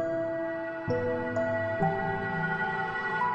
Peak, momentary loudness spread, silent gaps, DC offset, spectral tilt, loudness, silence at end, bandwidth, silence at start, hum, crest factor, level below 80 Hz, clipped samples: -14 dBFS; 3 LU; none; under 0.1%; -7.5 dB/octave; -30 LUFS; 0 s; 8.4 kHz; 0 s; none; 16 dB; -56 dBFS; under 0.1%